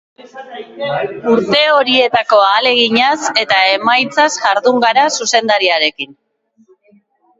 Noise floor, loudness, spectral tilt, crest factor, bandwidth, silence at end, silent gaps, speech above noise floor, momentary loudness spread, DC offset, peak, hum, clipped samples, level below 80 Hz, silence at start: -52 dBFS; -12 LUFS; -2 dB/octave; 14 dB; 8 kHz; 1.25 s; none; 40 dB; 11 LU; under 0.1%; 0 dBFS; none; under 0.1%; -60 dBFS; 0.2 s